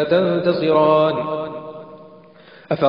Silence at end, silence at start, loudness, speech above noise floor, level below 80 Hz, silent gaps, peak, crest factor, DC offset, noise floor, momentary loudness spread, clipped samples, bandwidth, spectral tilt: 0 s; 0 s; -18 LUFS; 29 dB; -58 dBFS; none; -4 dBFS; 14 dB; 0.1%; -45 dBFS; 19 LU; under 0.1%; 5.4 kHz; -9 dB/octave